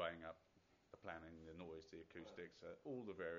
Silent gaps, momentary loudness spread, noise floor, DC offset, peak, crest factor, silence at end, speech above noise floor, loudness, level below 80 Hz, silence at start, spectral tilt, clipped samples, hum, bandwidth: none; 8 LU; -77 dBFS; under 0.1%; -32 dBFS; 22 dB; 0 s; 24 dB; -55 LUFS; -78 dBFS; 0 s; -3.5 dB/octave; under 0.1%; none; 7.2 kHz